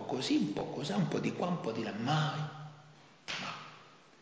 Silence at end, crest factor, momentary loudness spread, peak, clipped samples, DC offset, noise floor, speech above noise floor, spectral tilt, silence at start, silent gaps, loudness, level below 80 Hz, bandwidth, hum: 0.25 s; 16 dB; 18 LU; -20 dBFS; under 0.1%; under 0.1%; -58 dBFS; 25 dB; -5.5 dB/octave; 0 s; none; -35 LUFS; -72 dBFS; 8 kHz; none